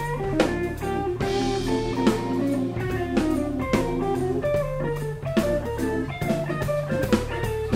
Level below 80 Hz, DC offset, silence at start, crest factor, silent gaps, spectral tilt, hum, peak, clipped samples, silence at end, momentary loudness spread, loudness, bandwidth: -38 dBFS; under 0.1%; 0 s; 20 dB; none; -6.5 dB/octave; none; -4 dBFS; under 0.1%; 0 s; 4 LU; -25 LUFS; 16 kHz